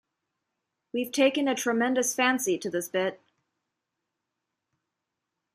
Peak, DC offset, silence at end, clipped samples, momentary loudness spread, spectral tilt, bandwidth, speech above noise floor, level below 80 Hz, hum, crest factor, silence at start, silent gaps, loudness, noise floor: -10 dBFS; under 0.1%; 2.4 s; under 0.1%; 8 LU; -2.5 dB/octave; 15.5 kHz; 58 dB; -80 dBFS; none; 20 dB; 0.95 s; none; -27 LUFS; -85 dBFS